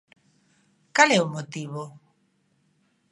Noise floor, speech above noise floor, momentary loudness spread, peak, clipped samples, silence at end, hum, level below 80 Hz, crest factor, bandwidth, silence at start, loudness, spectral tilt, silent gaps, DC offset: -68 dBFS; 45 dB; 19 LU; -2 dBFS; under 0.1%; 1.2 s; none; -78 dBFS; 26 dB; 11.5 kHz; 0.95 s; -22 LUFS; -3.5 dB/octave; none; under 0.1%